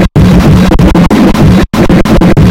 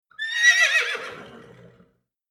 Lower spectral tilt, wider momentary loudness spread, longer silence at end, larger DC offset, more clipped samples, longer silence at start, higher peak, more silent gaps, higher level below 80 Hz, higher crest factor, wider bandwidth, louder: first, -7.5 dB/octave vs 1.5 dB/octave; second, 2 LU vs 16 LU; second, 0 s vs 0.9 s; neither; first, 10% vs under 0.1%; second, 0 s vs 0.2 s; first, 0 dBFS vs -4 dBFS; neither; first, -12 dBFS vs -72 dBFS; second, 4 dB vs 20 dB; about the same, 16.5 kHz vs 16 kHz; first, -5 LUFS vs -18 LUFS